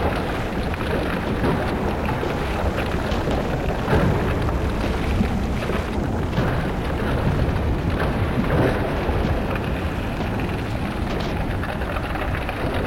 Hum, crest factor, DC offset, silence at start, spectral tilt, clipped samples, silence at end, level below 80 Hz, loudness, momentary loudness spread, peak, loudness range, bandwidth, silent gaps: none; 16 dB; under 0.1%; 0 s; -7 dB/octave; under 0.1%; 0 s; -28 dBFS; -23 LUFS; 4 LU; -6 dBFS; 2 LU; 16.5 kHz; none